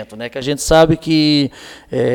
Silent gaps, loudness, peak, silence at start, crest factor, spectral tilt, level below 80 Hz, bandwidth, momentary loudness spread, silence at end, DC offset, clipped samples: none; -15 LUFS; 0 dBFS; 0 s; 14 dB; -5 dB/octave; -34 dBFS; 17.5 kHz; 12 LU; 0 s; under 0.1%; under 0.1%